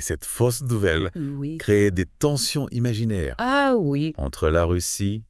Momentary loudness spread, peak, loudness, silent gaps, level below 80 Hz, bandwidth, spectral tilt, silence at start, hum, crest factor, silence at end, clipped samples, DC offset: 8 LU; -6 dBFS; -23 LUFS; none; -40 dBFS; 12 kHz; -5 dB/octave; 0 s; none; 16 dB; 0.05 s; under 0.1%; under 0.1%